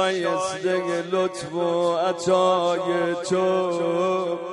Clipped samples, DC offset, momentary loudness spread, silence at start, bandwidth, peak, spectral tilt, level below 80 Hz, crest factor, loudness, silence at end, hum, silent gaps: under 0.1%; under 0.1%; 4 LU; 0 s; 11.5 kHz; -8 dBFS; -5 dB/octave; -66 dBFS; 14 dB; -23 LUFS; 0 s; none; none